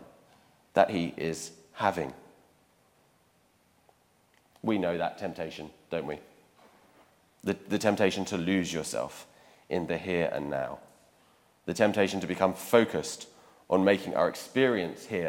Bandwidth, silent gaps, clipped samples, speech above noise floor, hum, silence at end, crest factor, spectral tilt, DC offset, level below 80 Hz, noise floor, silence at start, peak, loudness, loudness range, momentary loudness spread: 17 kHz; none; under 0.1%; 38 dB; none; 0 s; 24 dB; -5 dB/octave; under 0.1%; -66 dBFS; -67 dBFS; 0 s; -6 dBFS; -30 LUFS; 9 LU; 14 LU